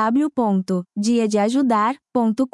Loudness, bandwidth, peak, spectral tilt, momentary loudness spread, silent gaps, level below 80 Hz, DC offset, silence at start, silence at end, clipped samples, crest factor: -20 LUFS; 11.5 kHz; -6 dBFS; -6 dB/octave; 4 LU; none; -68 dBFS; under 0.1%; 0 s; 0.05 s; under 0.1%; 12 dB